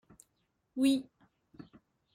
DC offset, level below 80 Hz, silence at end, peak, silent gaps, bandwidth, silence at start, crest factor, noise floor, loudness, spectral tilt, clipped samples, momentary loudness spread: under 0.1%; -74 dBFS; 1.1 s; -16 dBFS; none; 16 kHz; 0.75 s; 20 dB; -79 dBFS; -32 LUFS; -4 dB/octave; under 0.1%; 26 LU